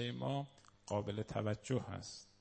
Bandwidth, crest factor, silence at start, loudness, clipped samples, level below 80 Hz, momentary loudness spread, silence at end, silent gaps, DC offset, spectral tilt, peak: 8.4 kHz; 18 dB; 0 s; -42 LUFS; under 0.1%; -68 dBFS; 11 LU; 0.15 s; none; under 0.1%; -6 dB/octave; -22 dBFS